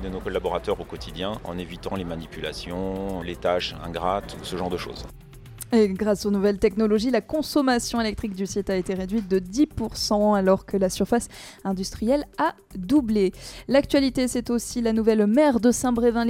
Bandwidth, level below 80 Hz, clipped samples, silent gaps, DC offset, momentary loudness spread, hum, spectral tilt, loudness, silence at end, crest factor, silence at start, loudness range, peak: 16.5 kHz; -44 dBFS; under 0.1%; none; under 0.1%; 12 LU; none; -5 dB/octave; -24 LUFS; 0 s; 18 dB; 0 s; 7 LU; -6 dBFS